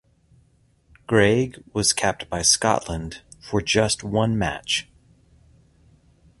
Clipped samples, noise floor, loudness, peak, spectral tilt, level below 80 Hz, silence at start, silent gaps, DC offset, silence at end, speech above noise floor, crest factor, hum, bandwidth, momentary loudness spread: under 0.1%; -60 dBFS; -21 LUFS; -4 dBFS; -3.5 dB/octave; -46 dBFS; 1.1 s; none; under 0.1%; 1.6 s; 39 dB; 22 dB; none; 12 kHz; 10 LU